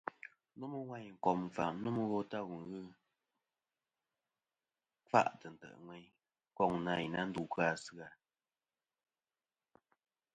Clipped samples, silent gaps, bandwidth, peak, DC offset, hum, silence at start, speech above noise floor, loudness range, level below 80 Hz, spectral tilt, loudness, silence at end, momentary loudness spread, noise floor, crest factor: under 0.1%; none; 9 kHz; -14 dBFS; under 0.1%; none; 0.05 s; over 52 dB; 5 LU; -76 dBFS; -6 dB/octave; -38 LUFS; 2.2 s; 21 LU; under -90 dBFS; 28 dB